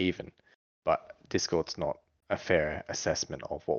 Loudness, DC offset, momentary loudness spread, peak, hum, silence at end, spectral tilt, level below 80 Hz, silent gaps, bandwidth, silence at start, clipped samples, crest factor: -32 LUFS; under 0.1%; 9 LU; -12 dBFS; none; 0 s; -4 dB/octave; -58 dBFS; 0.55-0.82 s; 7.6 kHz; 0 s; under 0.1%; 22 dB